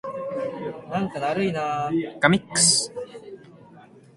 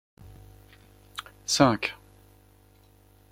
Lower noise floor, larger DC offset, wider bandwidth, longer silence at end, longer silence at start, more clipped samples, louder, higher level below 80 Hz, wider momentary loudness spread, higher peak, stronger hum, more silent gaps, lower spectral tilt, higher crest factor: second, -49 dBFS vs -58 dBFS; neither; second, 11.5 kHz vs 16 kHz; second, 0.2 s vs 1.35 s; second, 0.05 s vs 0.25 s; neither; about the same, -23 LUFS vs -25 LUFS; about the same, -60 dBFS vs -56 dBFS; about the same, 19 LU vs 20 LU; about the same, -2 dBFS vs -4 dBFS; second, none vs 50 Hz at -55 dBFS; neither; about the same, -3 dB/octave vs -4 dB/octave; about the same, 24 dB vs 28 dB